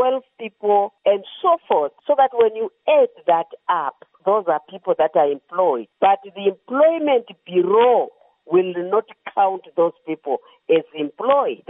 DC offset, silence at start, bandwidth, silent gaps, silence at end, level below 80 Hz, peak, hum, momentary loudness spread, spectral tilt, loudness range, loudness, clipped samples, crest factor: under 0.1%; 0 s; 3.9 kHz; none; 0.15 s; -80 dBFS; -4 dBFS; none; 9 LU; -3.5 dB/octave; 2 LU; -20 LUFS; under 0.1%; 14 dB